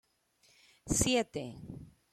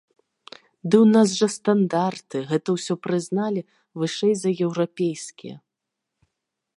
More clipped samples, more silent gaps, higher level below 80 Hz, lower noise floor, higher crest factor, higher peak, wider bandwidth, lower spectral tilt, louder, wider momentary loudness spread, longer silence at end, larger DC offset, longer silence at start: neither; neither; first, -52 dBFS vs -74 dBFS; second, -70 dBFS vs -83 dBFS; about the same, 22 dB vs 20 dB; second, -14 dBFS vs -4 dBFS; first, 15.5 kHz vs 11 kHz; second, -3.5 dB/octave vs -5.5 dB/octave; second, -32 LUFS vs -22 LUFS; first, 22 LU vs 18 LU; second, 0.25 s vs 1.2 s; neither; about the same, 0.85 s vs 0.85 s